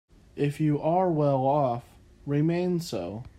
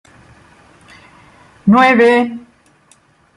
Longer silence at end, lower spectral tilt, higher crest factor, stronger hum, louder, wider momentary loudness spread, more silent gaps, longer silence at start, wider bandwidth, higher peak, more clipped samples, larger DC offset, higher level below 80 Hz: second, 0.1 s vs 1 s; first, -8 dB/octave vs -6.5 dB/octave; about the same, 14 dB vs 16 dB; neither; second, -27 LUFS vs -11 LUFS; second, 11 LU vs 14 LU; neither; second, 0.35 s vs 1.65 s; first, 15 kHz vs 11 kHz; second, -12 dBFS vs 0 dBFS; neither; neither; about the same, -58 dBFS vs -56 dBFS